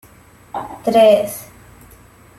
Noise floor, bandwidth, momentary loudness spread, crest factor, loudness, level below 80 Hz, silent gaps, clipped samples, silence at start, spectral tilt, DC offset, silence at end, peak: -46 dBFS; 15.5 kHz; 19 LU; 16 dB; -14 LUFS; -52 dBFS; none; under 0.1%; 0.55 s; -4.5 dB/octave; under 0.1%; 0.95 s; -2 dBFS